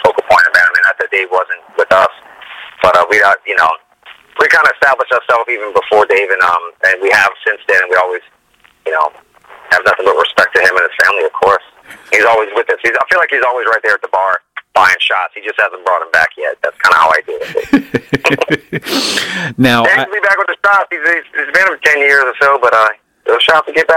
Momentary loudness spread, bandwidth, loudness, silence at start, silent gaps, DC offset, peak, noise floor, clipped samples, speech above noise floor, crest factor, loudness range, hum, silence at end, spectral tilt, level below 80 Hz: 8 LU; 17 kHz; -11 LUFS; 0 s; none; under 0.1%; 0 dBFS; -49 dBFS; under 0.1%; 38 dB; 12 dB; 2 LU; none; 0 s; -3.5 dB/octave; -50 dBFS